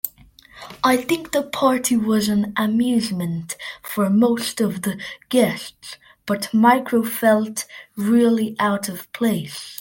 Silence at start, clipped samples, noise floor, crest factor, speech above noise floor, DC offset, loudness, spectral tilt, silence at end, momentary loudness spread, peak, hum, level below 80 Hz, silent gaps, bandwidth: 0.05 s; under 0.1%; -48 dBFS; 18 dB; 28 dB; under 0.1%; -20 LUFS; -5 dB/octave; 0.05 s; 14 LU; -2 dBFS; none; -60 dBFS; none; 17 kHz